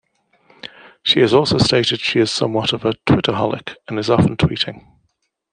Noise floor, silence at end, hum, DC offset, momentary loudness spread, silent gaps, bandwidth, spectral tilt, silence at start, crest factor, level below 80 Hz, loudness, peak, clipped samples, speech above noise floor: -68 dBFS; 0.75 s; none; under 0.1%; 14 LU; none; 10 kHz; -5.5 dB/octave; 0.65 s; 16 dB; -44 dBFS; -17 LUFS; -2 dBFS; under 0.1%; 51 dB